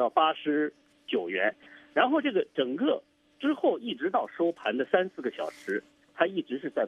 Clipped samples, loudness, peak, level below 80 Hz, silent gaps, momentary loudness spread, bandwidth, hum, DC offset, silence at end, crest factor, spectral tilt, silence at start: under 0.1%; -29 LUFS; -8 dBFS; -80 dBFS; none; 9 LU; 10 kHz; none; under 0.1%; 0 s; 22 dB; -6 dB/octave; 0 s